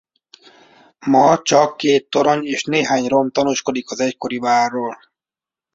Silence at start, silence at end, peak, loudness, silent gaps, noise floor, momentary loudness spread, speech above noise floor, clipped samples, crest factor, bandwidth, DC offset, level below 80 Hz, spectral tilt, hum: 1 s; 0.8 s; -2 dBFS; -17 LUFS; none; -90 dBFS; 9 LU; 73 dB; under 0.1%; 16 dB; 7.8 kHz; under 0.1%; -62 dBFS; -4 dB/octave; none